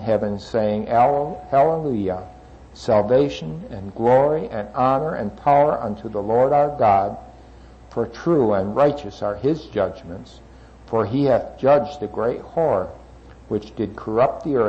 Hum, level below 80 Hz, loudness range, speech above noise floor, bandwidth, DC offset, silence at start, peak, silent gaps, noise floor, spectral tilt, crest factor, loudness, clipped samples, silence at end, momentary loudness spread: none; -46 dBFS; 3 LU; 24 dB; 8.2 kHz; under 0.1%; 0 s; -6 dBFS; none; -44 dBFS; -8 dB/octave; 16 dB; -20 LUFS; under 0.1%; 0 s; 12 LU